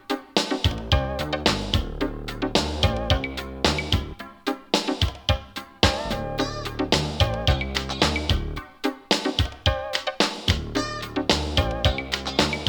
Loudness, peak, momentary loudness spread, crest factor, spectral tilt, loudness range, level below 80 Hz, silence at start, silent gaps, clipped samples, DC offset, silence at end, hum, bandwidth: -24 LUFS; -2 dBFS; 8 LU; 24 dB; -4.5 dB/octave; 1 LU; -32 dBFS; 0.1 s; none; under 0.1%; under 0.1%; 0 s; none; over 20 kHz